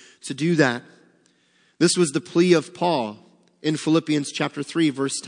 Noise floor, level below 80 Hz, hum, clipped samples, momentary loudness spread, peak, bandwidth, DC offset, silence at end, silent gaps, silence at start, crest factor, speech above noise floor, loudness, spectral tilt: -62 dBFS; -74 dBFS; none; under 0.1%; 8 LU; -4 dBFS; 10.5 kHz; under 0.1%; 0 s; none; 0.25 s; 20 dB; 41 dB; -22 LUFS; -4.5 dB/octave